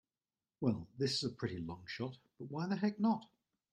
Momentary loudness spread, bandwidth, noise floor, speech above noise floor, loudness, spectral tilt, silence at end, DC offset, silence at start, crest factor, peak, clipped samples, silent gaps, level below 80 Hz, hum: 10 LU; 10 kHz; under -90 dBFS; over 52 dB; -39 LUFS; -6 dB/octave; 0.45 s; under 0.1%; 0.6 s; 20 dB; -20 dBFS; under 0.1%; none; -72 dBFS; none